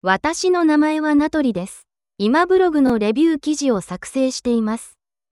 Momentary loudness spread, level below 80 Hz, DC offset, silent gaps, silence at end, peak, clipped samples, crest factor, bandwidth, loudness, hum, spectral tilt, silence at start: 9 LU; -52 dBFS; under 0.1%; none; 0.45 s; -2 dBFS; under 0.1%; 16 dB; 12 kHz; -18 LUFS; none; -4.5 dB/octave; 0.05 s